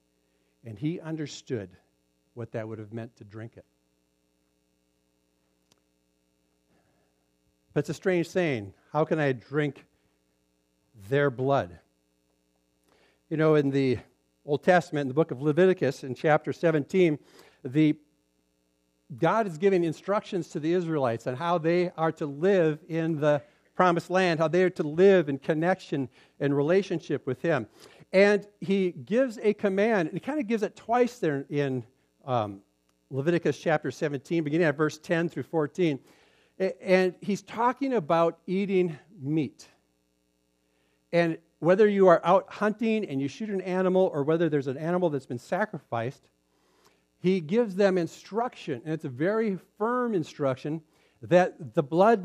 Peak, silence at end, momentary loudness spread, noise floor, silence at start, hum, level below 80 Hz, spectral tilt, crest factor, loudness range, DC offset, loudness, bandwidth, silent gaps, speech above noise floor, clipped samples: -6 dBFS; 0 s; 12 LU; -72 dBFS; 0.65 s; none; -74 dBFS; -7 dB/octave; 22 dB; 8 LU; under 0.1%; -27 LUFS; 12 kHz; none; 46 dB; under 0.1%